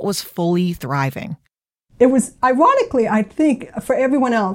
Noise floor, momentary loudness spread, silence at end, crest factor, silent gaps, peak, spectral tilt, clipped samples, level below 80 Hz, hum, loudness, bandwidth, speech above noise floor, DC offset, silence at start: -68 dBFS; 10 LU; 0 s; 16 dB; none; -2 dBFS; -6 dB/octave; under 0.1%; -52 dBFS; none; -17 LUFS; 17 kHz; 51 dB; under 0.1%; 0 s